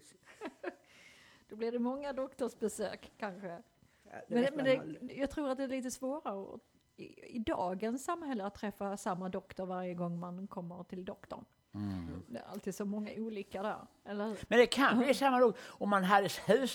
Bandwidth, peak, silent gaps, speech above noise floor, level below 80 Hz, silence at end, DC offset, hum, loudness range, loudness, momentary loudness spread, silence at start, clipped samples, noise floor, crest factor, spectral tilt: 19.5 kHz; -14 dBFS; none; 26 dB; -66 dBFS; 0 s; under 0.1%; none; 11 LU; -35 LUFS; 19 LU; 0.05 s; under 0.1%; -61 dBFS; 22 dB; -5 dB/octave